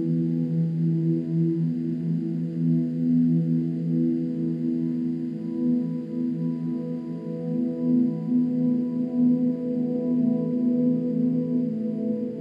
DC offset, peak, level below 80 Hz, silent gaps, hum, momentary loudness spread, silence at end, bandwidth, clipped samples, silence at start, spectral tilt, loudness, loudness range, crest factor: under 0.1%; -12 dBFS; -78 dBFS; none; none; 6 LU; 0 s; 4.9 kHz; under 0.1%; 0 s; -12 dB/octave; -25 LUFS; 3 LU; 12 dB